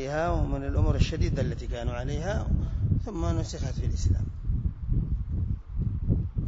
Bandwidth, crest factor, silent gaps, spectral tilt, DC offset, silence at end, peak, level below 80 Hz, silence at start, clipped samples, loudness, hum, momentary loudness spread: 7.8 kHz; 18 dB; none; -7 dB/octave; under 0.1%; 0 s; -8 dBFS; -30 dBFS; 0 s; under 0.1%; -30 LUFS; none; 5 LU